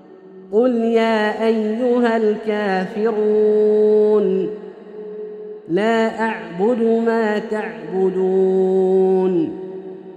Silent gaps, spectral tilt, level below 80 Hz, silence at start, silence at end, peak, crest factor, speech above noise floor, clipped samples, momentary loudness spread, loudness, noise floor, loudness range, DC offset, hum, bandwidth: none; -7.5 dB/octave; -66 dBFS; 0.1 s; 0 s; -4 dBFS; 12 dB; 24 dB; under 0.1%; 17 LU; -18 LUFS; -41 dBFS; 3 LU; under 0.1%; none; 9 kHz